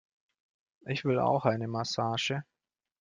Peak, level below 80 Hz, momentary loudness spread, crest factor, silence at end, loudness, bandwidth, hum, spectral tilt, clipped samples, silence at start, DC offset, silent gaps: -12 dBFS; -70 dBFS; 10 LU; 22 dB; 0.6 s; -31 LUFS; 9.8 kHz; none; -5.5 dB/octave; under 0.1%; 0.85 s; under 0.1%; none